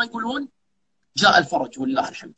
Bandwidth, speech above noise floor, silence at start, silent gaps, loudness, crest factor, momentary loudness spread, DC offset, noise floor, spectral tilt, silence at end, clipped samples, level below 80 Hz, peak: 8.6 kHz; 55 dB; 0 s; none; -21 LUFS; 20 dB; 14 LU; under 0.1%; -76 dBFS; -3 dB/octave; 0.1 s; under 0.1%; -60 dBFS; -2 dBFS